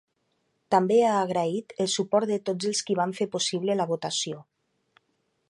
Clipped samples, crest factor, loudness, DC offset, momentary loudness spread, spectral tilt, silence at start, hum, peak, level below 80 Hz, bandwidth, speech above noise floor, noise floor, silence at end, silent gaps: under 0.1%; 20 dB; -26 LUFS; under 0.1%; 8 LU; -4 dB/octave; 0.7 s; none; -8 dBFS; -76 dBFS; 11.5 kHz; 48 dB; -74 dBFS; 1.1 s; none